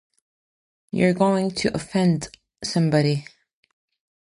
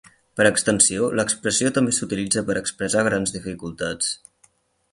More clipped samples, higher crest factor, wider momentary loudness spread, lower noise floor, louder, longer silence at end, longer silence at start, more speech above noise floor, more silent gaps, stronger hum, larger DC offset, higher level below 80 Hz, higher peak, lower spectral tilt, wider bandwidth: neither; about the same, 18 dB vs 20 dB; about the same, 11 LU vs 12 LU; first, under -90 dBFS vs -61 dBFS; about the same, -22 LUFS vs -21 LUFS; first, 1 s vs 0.75 s; first, 0.95 s vs 0.35 s; first, over 69 dB vs 39 dB; neither; neither; neither; about the same, -56 dBFS vs -52 dBFS; second, -6 dBFS vs -2 dBFS; first, -6 dB/octave vs -3 dB/octave; about the same, 11.5 kHz vs 11.5 kHz